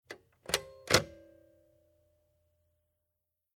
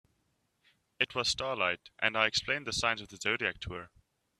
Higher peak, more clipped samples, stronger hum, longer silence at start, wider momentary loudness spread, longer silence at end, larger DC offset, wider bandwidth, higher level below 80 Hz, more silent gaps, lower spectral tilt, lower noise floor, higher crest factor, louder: first, -6 dBFS vs -10 dBFS; neither; neither; second, 0.1 s vs 1 s; first, 20 LU vs 6 LU; first, 2.5 s vs 0.55 s; neither; first, 19 kHz vs 14 kHz; about the same, -60 dBFS vs -60 dBFS; neither; about the same, -2.5 dB/octave vs -2 dB/octave; first, -86 dBFS vs -77 dBFS; first, 34 dB vs 26 dB; about the same, -31 LUFS vs -31 LUFS